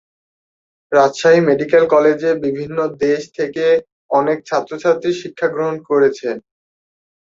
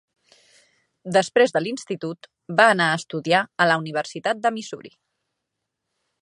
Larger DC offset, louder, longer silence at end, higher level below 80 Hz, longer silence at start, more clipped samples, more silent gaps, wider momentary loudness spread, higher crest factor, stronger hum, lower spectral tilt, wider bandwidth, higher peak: neither; first, -16 LUFS vs -21 LUFS; second, 0.95 s vs 1.35 s; first, -62 dBFS vs -74 dBFS; second, 0.9 s vs 1.05 s; neither; first, 3.92-4.09 s vs none; second, 9 LU vs 16 LU; second, 16 dB vs 22 dB; neither; first, -5.5 dB/octave vs -4 dB/octave; second, 7.8 kHz vs 11.5 kHz; about the same, 0 dBFS vs -2 dBFS